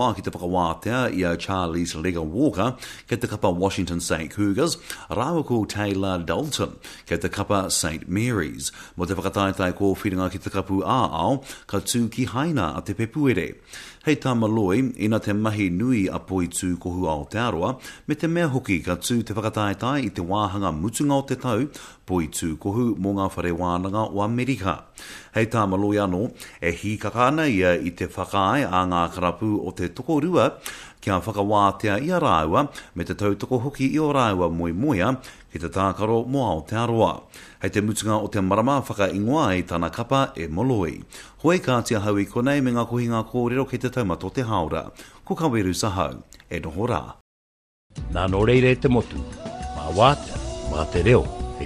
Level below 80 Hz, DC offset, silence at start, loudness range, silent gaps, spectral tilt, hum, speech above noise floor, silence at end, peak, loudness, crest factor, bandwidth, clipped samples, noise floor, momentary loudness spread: -42 dBFS; under 0.1%; 0 s; 3 LU; 47.21-47.90 s; -5.5 dB/octave; none; over 67 dB; 0 s; -4 dBFS; -24 LUFS; 20 dB; 14 kHz; under 0.1%; under -90 dBFS; 10 LU